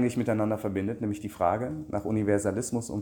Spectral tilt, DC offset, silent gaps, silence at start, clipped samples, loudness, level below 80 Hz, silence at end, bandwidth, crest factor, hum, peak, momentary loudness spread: -6.5 dB/octave; under 0.1%; none; 0 s; under 0.1%; -29 LUFS; -56 dBFS; 0 s; 17.5 kHz; 16 dB; none; -12 dBFS; 6 LU